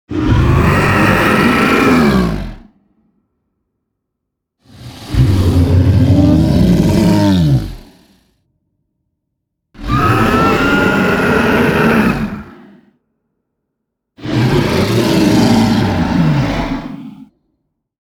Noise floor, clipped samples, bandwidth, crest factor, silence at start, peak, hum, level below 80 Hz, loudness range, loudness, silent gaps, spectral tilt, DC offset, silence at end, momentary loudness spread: -75 dBFS; under 0.1%; over 20 kHz; 14 dB; 0.1 s; 0 dBFS; none; -28 dBFS; 6 LU; -12 LUFS; none; -6.5 dB/octave; under 0.1%; 0.8 s; 11 LU